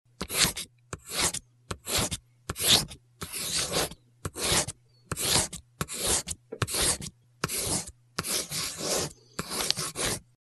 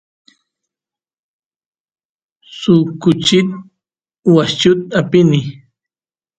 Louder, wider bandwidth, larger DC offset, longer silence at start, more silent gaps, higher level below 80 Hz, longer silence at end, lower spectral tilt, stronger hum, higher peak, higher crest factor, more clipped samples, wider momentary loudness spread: second, -28 LUFS vs -13 LUFS; first, 12.5 kHz vs 9 kHz; neither; second, 0.2 s vs 2.5 s; neither; first, -48 dBFS vs -54 dBFS; second, 0.2 s vs 0.85 s; second, -1.5 dB/octave vs -6 dB/octave; neither; about the same, 0 dBFS vs 0 dBFS; first, 30 dB vs 16 dB; neither; first, 15 LU vs 10 LU